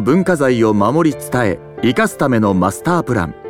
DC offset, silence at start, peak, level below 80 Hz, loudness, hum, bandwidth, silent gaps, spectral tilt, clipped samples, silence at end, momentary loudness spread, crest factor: under 0.1%; 0 s; -2 dBFS; -44 dBFS; -15 LUFS; none; 16.5 kHz; none; -6.5 dB/octave; under 0.1%; 0 s; 4 LU; 12 dB